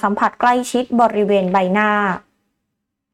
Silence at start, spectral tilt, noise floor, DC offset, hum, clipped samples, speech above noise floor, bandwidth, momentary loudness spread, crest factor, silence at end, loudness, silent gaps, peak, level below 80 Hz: 0 s; -5.5 dB/octave; -76 dBFS; under 0.1%; none; under 0.1%; 60 dB; 14 kHz; 4 LU; 14 dB; 0.95 s; -16 LUFS; none; -4 dBFS; -56 dBFS